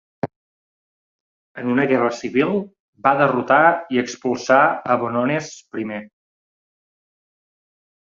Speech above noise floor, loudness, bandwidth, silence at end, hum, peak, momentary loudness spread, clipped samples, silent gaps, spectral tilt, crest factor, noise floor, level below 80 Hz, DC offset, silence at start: over 71 dB; -19 LUFS; 7.6 kHz; 1.95 s; none; 0 dBFS; 16 LU; under 0.1%; 0.36-1.55 s, 2.80-2.93 s; -5.5 dB/octave; 20 dB; under -90 dBFS; -64 dBFS; under 0.1%; 0.25 s